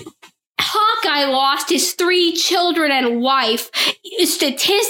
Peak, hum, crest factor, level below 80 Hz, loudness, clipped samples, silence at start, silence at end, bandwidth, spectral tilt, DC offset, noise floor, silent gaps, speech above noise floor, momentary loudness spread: -2 dBFS; none; 16 dB; -66 dBFS; -16 LUFS; under 0.1%; 0 s; 0 s; 17 kHz; -0.5 dB/octave; under 0.1%; -47 dBFS; 0.47-0.51 s; 30 dB; 3 LU